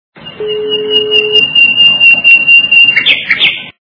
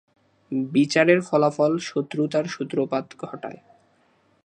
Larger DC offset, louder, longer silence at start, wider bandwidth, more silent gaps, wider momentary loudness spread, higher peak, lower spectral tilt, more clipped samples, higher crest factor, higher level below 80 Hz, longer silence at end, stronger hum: neither; first, -4 LUFS vs -22 LUFS; second, 0.2 s vs 0.5 s; second, 5.4 kHz vs 10 kHz; neither; second, 12 LU vs 16 LU; about the same, 0 dBFS vs -2 dBFS; second, -3 dB/octave vs -5.5 dB/octave; first, 3% vs under 0.1%; second, 8 dB vs 20 dB; first, -52 dBFS vs -74 dBFS; second, 0.1 s vs 0.95 s; neither